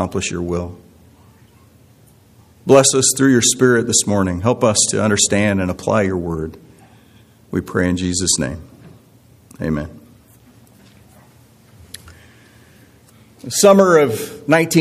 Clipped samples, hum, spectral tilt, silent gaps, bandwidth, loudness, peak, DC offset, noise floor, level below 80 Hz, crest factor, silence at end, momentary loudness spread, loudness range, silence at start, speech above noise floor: under 0.1%; none; -4 dB/octave; none; 15.5 kHz; -15 LUFS; 0 dBFS; under 0.1%; -49 dBFS; -46 dBFS; 18 dB; 0 s; 18 LU; 17 LU; 0 s; 33 dB